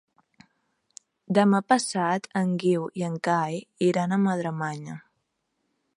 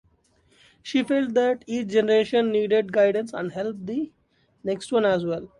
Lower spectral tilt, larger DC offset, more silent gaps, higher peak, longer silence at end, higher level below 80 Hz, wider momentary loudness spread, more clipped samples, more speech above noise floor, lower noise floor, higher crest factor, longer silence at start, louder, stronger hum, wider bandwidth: about the same, -6 dB/octave vs -5.5 dB/octave; neither; neither; about the same, -8 dBFS vs -8 dBFS; first, 0.95 s vs 0.1 s; second, -74 dBFS vs -64 dBFS; about the same, 11 LU vs 10 LU; neither; first, 52 dB vs 40 dB; first, -77 dBFS vs -63 dBFS; about the same, 20 dB vs 16 dB; first, 1.3 s vs 0.85 s; about the same, -25 LUFS vs -23 LUFS; neither; about the same, 11 kHz vs 11 kHz